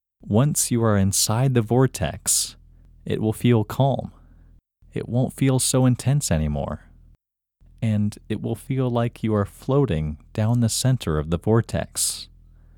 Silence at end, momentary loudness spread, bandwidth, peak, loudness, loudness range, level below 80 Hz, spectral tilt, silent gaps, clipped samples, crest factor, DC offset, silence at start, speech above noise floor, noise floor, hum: 0.5 s; 10 LU; 19 kHz; -6 dBFS; -22 LUFS; 4 LU; -42 dBFS; -5 dB/octave; none; under 0.1%; 18 dB; under 0.1%; 0.25 s; 41 dB; -62 dBFS; none